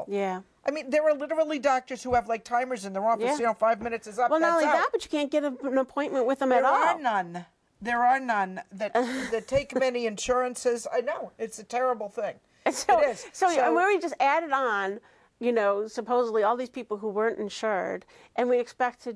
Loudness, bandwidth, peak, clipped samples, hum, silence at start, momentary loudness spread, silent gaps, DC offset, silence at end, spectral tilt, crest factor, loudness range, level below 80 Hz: -27 LUFS; 11 kHz; -12 dBFS; under 0.1%; none; 0 s; 10 LU; none; under 0.1%; 0 s; -4 dB/octave; 16 dB; 3 LU; -60 dBFS